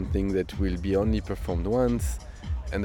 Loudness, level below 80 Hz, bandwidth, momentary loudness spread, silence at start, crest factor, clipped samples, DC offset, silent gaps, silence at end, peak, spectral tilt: -28 LUFS; -32 dBFS; 17.5 kHz; 9 LU; 0 s; 14 dB; under 0.1%; under 0.1%; none; 0 s; -12 dBFS; -7 dB/octave